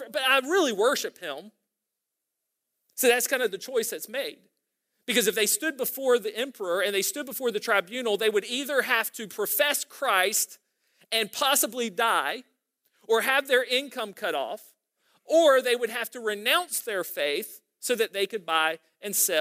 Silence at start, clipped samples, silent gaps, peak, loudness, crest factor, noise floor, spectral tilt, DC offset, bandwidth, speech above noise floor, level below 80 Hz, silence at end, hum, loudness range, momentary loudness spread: 0 s; under 0.1%; none; -8 dBFS; -25 LUFS; 20 dB; -85 dBFS; -1 dB/octave; under 0.1%; 16 kHz; 59 dB; -88 dBFS; 0 s; none; 3 LU; 10 LU